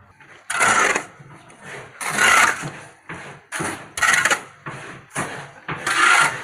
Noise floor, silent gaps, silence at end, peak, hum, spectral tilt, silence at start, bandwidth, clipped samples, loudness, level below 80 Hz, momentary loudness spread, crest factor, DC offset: -47 dBFS; none; 0 s; -2 dBFS; none; -1 dB/octave; 0.5 s; 16 kHz; under 0.1%; -18 LUFS; -58 dBFS; 22 LU; 20 dB; under 0.1%